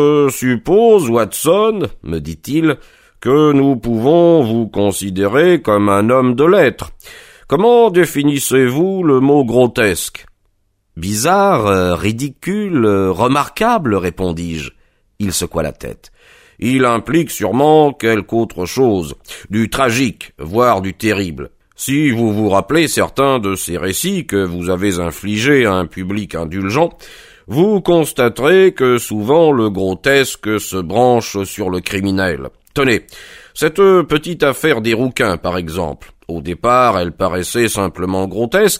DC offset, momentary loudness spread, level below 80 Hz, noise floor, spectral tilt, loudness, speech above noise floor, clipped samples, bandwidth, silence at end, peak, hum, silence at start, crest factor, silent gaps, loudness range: under 0.1%; 11 LU; -42 dBFS; -61 dBFS; -5 dB/octave; -14 LUFS; 47 dB; under 0.1%; 16 kHz; 0 s; 0 dBFS; none; 0 s; 14 dB; none; 4 LU